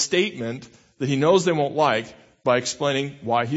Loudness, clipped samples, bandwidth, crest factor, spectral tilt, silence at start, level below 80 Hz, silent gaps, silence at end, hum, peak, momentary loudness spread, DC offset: -22 LUFS; under 0.1%; 8 kHz; 18 dB; -4.5 dB/octave; 0 s; -64 dBFS; none; 0 s; none; -4 dBFS; 13 LU; under 0.1%